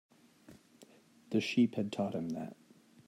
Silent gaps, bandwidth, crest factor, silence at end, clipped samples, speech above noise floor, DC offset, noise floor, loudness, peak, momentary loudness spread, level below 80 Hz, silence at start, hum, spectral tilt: none; 12.5 kHz; 18 dB; 0.55 s; under 0.1%; 28 dB; under 0.1%; -62 dBFS; -35 LUFS; -18 dBFS; 11 LU; -82 dBFS; 0.5 s; none; -6 dB/octave